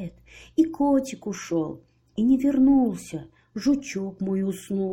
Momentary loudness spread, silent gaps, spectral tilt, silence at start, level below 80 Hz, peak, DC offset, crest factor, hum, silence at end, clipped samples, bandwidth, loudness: 18 LU; none; -6.5 dB/octave; 0 s; -54 dBFS; -8 dBFS; under 0.1%; 16 dB; none; 0 s; under 0.1%; 16.5 kHz; -24 LUFS